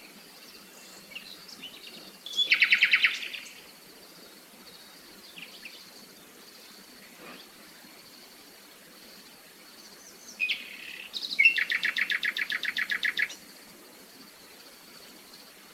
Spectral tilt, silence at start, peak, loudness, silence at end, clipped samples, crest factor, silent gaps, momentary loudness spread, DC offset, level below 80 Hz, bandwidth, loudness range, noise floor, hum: 0.5 dB/octave; 0 s; -8 dBFS; -25 LUFS; 0 s; under 0.1%; 26 dB; none; 27 LU; under 0.1%; -78 dBFS; 17 kHz; 22 LU; -52 dBFS; none